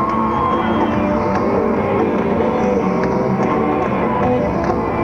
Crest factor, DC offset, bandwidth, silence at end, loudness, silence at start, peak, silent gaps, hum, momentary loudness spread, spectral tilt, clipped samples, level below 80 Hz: 12 dB; 0.3%; 7.2 kHz; 0 s; -17 LUFS; 0 s; -4 dBFS; none; none; 1 LU; -8 dB/octave; under 0.1%; -36 dBFS